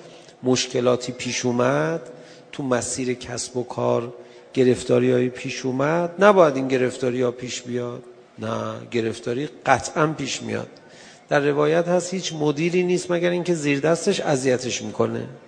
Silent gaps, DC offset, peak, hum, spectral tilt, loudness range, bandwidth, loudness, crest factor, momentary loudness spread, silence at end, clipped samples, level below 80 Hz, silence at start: none; under 0.1%; 0 dBFS; none; -5 dB/octave; 5 LU; 10 kHz; -22 LUFS; 22 dB; 10 LU; 0.1 s; under 0.1%; -60 dBFS; 0 s